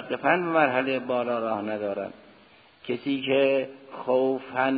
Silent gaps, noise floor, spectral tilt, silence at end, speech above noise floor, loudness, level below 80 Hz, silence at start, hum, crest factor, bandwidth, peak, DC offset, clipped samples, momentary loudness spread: none; -55 dBFS; -9.5 dB/octave; 0 s; 30 dB; -26 LUFS; -72 dBFS; 0 s; none; 18 dB; 5 kHz; -8 dBFS; under 0.1%; under 0.1%; 12 LU